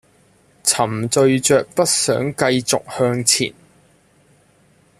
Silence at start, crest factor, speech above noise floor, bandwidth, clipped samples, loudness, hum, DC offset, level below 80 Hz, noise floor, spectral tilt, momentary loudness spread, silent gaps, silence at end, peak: 0.65 s; 18 dB; 38 dB; 15 kHz; under 0.1%; -17 LUFS; none; under 0.1%; -56 dBFS; -55 dBFS; -3.5 dB/octave; 5 LU; none; 1.5 s; -2 dBFS